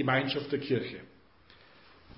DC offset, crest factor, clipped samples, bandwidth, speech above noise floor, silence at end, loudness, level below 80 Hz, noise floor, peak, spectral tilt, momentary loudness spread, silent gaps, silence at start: under 0.1%; 22 dB; under 0.1%; 5.6 kHz; 29 dB; 1.1 s; -32 LUFS; -66 dBFS; -60 dBFS; -12 dBFS; -4 dB/octave; 14 LU; none; 0 s